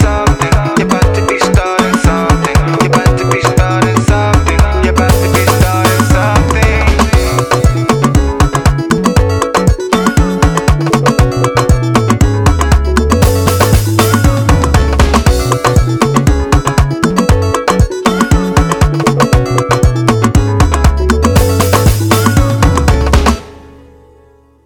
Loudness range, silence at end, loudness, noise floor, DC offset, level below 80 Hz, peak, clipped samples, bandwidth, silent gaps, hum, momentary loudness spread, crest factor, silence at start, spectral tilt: 1 LU; 1.1 s; -10 LUFS; -44 dBFS; under 0.1%; -16 dBFS; 0 dBFS; 0.4%; over 20 kHz; none; none; 2 LU; 10 dB; 0 s; -5.5 dB/octave